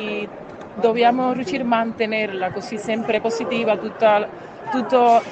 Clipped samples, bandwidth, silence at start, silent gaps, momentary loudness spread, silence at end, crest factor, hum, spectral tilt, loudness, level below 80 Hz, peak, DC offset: under 0.1%; 8.6 kHz; 0 s; none; 12 LU; 0 s; 16 dB; none; -5 dB/octave; -20 LUFS; -62 dBFS; -4 dBFS; under 0.1%